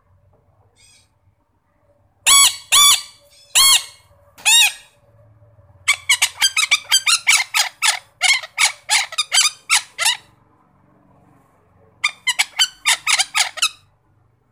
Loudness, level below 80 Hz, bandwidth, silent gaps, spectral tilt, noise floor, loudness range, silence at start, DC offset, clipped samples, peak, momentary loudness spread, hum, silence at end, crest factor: -14 LUFS; -60 dBFS; 16.5 kHz; none; 4 dB/octave; -63 dBFS; 7 LU; 2.25 s; under 0.1%; under 0.1%; -2 dBFS; 9 LU; none; 0.8 s; 18 dB